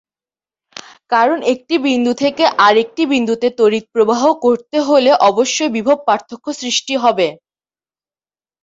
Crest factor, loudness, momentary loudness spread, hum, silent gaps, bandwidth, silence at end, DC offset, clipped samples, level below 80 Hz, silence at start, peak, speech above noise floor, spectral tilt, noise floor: 14 dB; -14 LUFS; 7 LU; none; none; 8 kHz; 1.3 s; under 0.1%; under 0.1%; -62 dBFS; 0.75 s; 0 dBFS; over 76 dB; -3 dB/octave; under -90 dBFS